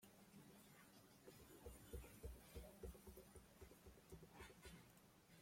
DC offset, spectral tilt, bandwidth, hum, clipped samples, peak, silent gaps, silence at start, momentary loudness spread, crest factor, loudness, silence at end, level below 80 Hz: under 0.1%; -4.5 dB/octave; 16.5 kHz; none; under 0.1%; -42 dBFS; none; 0 s; 8 LU; 20 dB; -63 LUFS; 0 s; -66 dBFS